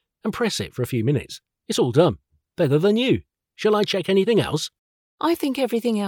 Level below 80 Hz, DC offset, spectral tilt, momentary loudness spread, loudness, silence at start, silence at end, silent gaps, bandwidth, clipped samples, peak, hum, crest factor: -56 dBFS; under 0.1%; -5.5 dB/octave; 11 LU; -22 LUFS; 0.25 s; 0 s; 4.78-5.18 s; 19 kHz; under 0.1%; -4 dBFS; none; 18 dB